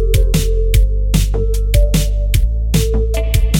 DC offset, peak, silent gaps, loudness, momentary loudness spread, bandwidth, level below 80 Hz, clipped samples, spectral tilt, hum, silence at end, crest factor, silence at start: under 0.1%; 0 dBFS; none; -16 LUFS; 2 LU; 17 kHz; -14 dBFS; under 0.1%; -5.5 dB/octave; none; 0 s; 12 dB; 0 s